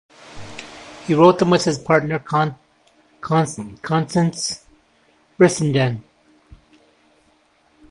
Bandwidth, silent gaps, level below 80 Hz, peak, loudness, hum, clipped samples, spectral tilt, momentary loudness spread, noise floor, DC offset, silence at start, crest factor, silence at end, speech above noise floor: 11.5 kHz; none; -54 dBFS; 0 dBFS; -18 LUFS; none; under 0.1%; -5.5 dB/octave; 22 LU; -59 dBFS; under 0.1%; 0.3 s; 20 dB; 1.9 s; 41 dB